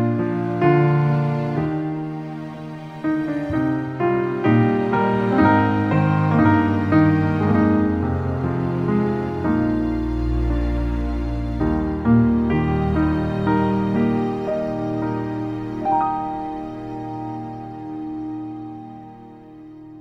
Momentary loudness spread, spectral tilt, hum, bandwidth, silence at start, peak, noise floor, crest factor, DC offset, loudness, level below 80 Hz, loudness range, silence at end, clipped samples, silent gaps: 14 LU; -9.5 dB/octave; none; 6.6 kHz; 0 s; -4 dBFS; -41 dBFS; 16 dB; under 0.1%; -21 LUFS; -34 dBFS; 9 LU; 0 s; under 0.1%; none